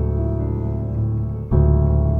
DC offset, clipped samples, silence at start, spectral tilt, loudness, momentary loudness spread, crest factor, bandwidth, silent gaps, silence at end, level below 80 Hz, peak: under 0.1%; under 0.1%; 0 s; -13.5 dB/octave; -20 LUFS; 7 LU; 14 dB; 2.2 kHz; none; 0 s; -22 dBFS; -4 dBFS